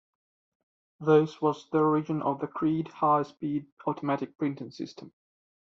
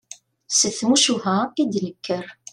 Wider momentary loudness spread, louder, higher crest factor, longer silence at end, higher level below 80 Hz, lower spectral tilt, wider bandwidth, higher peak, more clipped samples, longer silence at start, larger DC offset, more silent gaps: about the same, 11 LU vs 11 LU; second, -28 LUFS vs -20 LUFS; about the same, 20 dB vs 18 dB; first, 0.6 s vs 0.2 s; second, -72 dBFS vs -66 dBFS; first, -7 dB/octave vs -2.5 dB/octave; second, 7.2 kHz vs 13 kHz; second, -10 dBFS vs -4 dBFS; neither; first, 1 s vs 0.1 s; neither; first, 3.72-3.77 s vs none